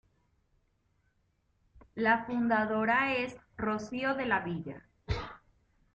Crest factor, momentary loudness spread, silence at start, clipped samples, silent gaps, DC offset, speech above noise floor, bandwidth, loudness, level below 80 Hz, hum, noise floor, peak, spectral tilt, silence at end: 18 dB; 14 LU; 1.95 s; under 0.1%; none; under 0.1%; 43 dB; 8.2 kHz; -31 LUFS; -54 dBFS; none; -74 dBFS; -16 dBFS; -6.5 dB/octave; 0.55 s